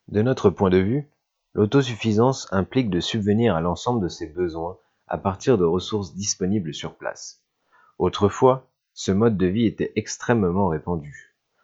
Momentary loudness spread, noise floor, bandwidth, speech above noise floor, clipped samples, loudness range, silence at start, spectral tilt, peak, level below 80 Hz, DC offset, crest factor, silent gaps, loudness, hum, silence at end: 12 LU; -60 dBFS; 8 kHz; 38 dB; under 0.1%; 3 LU; 0.1 s; -6 dB/octave; -2 dBFS; -50 dBFS; under 0.1%; 20 dB; none; -23 LUFS; none; 0.45 s